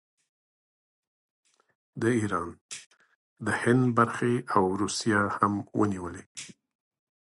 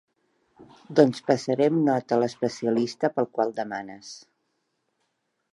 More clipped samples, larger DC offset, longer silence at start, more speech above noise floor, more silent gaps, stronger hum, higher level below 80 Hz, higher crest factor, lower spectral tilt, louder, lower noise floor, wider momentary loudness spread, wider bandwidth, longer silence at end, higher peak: neither; neither; first, 1.95 s vs 0.9 s; first, over 63 dB vs 52 dB; first, 2.61-2.69 s, 2.86-2.90 s, 3.15-3.36 s, 6.26-6.35 s vs none; neither; first, -60 dBFS vs -74 dBFS; about the same, 22 dB vs 22 dB; about the same, -5.5 dB/octave vs -6.5 dB/octave; about the same, -27 LUFS vs -25 LUFS; first, under -90 dBFS vs -76 dBFS; about the same, 18 LU vs 16 LU; about the same, 11.5 kHz vs 11.5 kHz; second, 0.7 s vs 1.35 s; second, -8 dBFS vs -4 dBFS